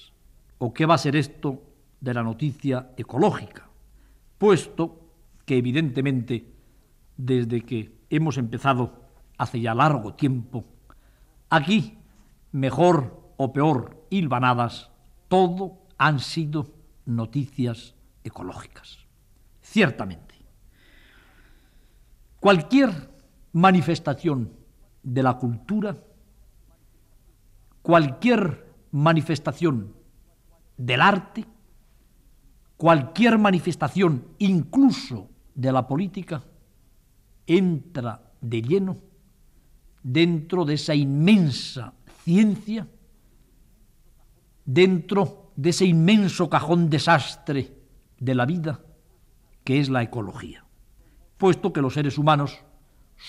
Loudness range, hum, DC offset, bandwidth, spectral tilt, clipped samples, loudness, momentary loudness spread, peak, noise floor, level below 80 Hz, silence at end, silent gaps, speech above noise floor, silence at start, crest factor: 6 LU; none; under 0.1%; 12.5 kHz; -6.5 dB/octave; under 0.1%; -23 LUFS; 18 LU; -6 dBFS; -57 dBFS; -54 dBFS; 0 s; none; 35 dB; 0.6 s; 18 dB